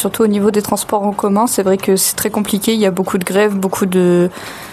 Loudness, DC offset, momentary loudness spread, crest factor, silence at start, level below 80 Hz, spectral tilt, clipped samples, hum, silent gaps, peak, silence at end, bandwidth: -14 LUFS; under 0.1%; 4 LU; 14 dB; 0 s; -50 dBFS; -4.5 dB/octave; under 0.1%; none; none; 0 dBFS; 0 s; 14.5 kHz